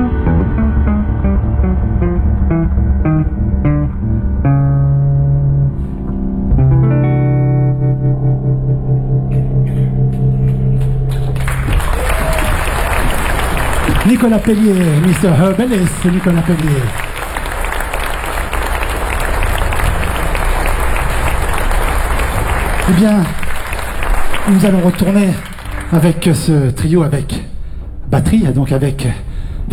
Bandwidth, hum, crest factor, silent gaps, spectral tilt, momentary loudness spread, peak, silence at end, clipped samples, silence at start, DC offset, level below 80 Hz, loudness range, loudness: 16 kHz; none; 10 dB; none; -6.5 dB/octave; 8 LU; -2 dBFS; 0 s; under 0.1%; 0 s; under 0.1%; -18 dBFS; 4 LU; -14 LUFS